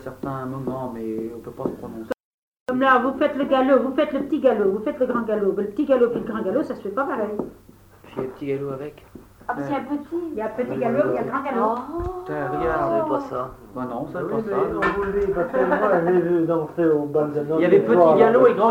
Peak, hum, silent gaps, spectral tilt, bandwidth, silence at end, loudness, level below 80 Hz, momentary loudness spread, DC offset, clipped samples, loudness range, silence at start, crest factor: -2 dBFS; none; 2.24-2.52 s, 2.60-2.66 s; -8 dB/octave; 16 kHz; 0 s; -22 LUFS; -48 dBFS; 14 LU; under 0.1%; under 0.1%; 8 LU; 0 s; 20 dB